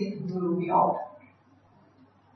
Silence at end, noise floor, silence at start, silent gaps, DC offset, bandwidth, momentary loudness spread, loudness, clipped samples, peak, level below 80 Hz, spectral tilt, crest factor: 1.15 s; -60 dBFS; 0 s; none; under 0.1%; 6.2 kHz; 11 LU; -27 LUFS; under 0.1%; -10 dBFS; -78 dBFS; -9.5 dB/octave; 20 dB